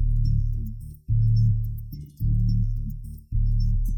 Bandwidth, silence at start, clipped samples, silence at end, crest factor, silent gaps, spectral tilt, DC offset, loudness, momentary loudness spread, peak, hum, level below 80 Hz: 14.5 kHz; 0 s; under 0.1%; 0 s; 10 dB; none; -10 dB/octave; under 0.1%; -26 LUFS; 14 LU; -12 dBFS; none; -26 dBFS